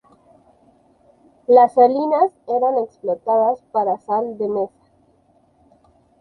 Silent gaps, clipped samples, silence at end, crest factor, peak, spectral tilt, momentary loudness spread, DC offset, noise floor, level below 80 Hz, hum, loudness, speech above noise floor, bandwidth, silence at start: none; under 0.1%; 1.55 s; 18 dB; -2 dBFS; -8 dB/octave; 11 LU; under 0.1%; -58 dBFS; -68 dBFS; none; -18 LUFS; 41 dB; 4.7 kHz; 1.5 s